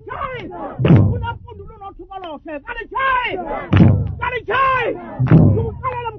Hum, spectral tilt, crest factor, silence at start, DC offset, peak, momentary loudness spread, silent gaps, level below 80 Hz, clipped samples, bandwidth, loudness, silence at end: none; -10 dB/octave; 18 dB; 0.05 s; under 0.1%; 0 dBFS; 20 LU; none; -34 dBFS; under 0.1%; 5.4 kHz; -17 LUFS; 0 s